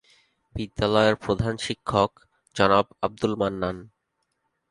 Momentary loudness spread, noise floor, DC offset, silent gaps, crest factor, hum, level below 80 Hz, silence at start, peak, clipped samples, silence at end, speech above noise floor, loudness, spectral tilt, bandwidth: 14 LU; -77 dBFS; under 0.1%; none; 22 dB; none; -48 dBFS; 0.55 s; -4 dBFS; under 0.1%; 0.85 s; 53 dB; -24 LUFS; -5.5 dB/octave; 11.5 kHz